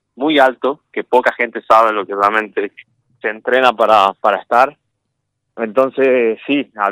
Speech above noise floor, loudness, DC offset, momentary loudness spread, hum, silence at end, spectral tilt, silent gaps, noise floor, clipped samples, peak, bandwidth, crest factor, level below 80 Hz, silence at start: 58 dB; -15 LUFS; under 0.1%; 11 LU; none; 0 s; -4.5 dB/octave; none; -73 dBFS; 0.3%; 0 dBFS; 16 kHz; 16 dB; -62 dBFS; 0.2 s